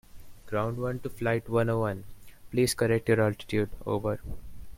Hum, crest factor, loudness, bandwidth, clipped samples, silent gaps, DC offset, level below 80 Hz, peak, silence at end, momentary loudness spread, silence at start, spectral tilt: none; 18 dB; -29 LUFS; 16.5 kHz; under 0.1%; none; under 0.1%; -48 dBFS; -10 dBFS; 0 s; 10 LU; 0.15 s; -6 dB/octave